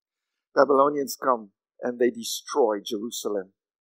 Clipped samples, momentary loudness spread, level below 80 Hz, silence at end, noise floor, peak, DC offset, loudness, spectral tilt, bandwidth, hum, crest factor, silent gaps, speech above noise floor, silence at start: under 0.1%; 11 LU; under -90 dBFS; 0.35 s; -79 dBFS; -4 dBFS; under 0.1%; -25 LUFS; -3 dB/octave; 16 kHz; none; 22 dB; none; 55 dB; 0.55 s